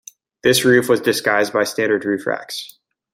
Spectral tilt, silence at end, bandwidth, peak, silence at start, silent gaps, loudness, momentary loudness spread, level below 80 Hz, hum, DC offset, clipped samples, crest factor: -3.5 dB/octave; 0.45 s; 16.5 kHz; -2 dBFS; 0.45 s; none; -17 LUFS; 13 LU; -58 dBFS; none; under 0.1%; under 0.1%; 16 dB